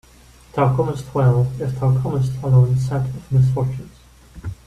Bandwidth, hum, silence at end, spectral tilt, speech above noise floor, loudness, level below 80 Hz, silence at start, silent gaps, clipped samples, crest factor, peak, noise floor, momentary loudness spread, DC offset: 9.4 kHz; none; 0.1 s; -9 dB/octave; 29 dB; -19 LUFS; -42 dBFS; 0.55 s; none; under 0.1%; 14 dB; -4 dBFS; -47 dBFS; 11 LU; under 0.1%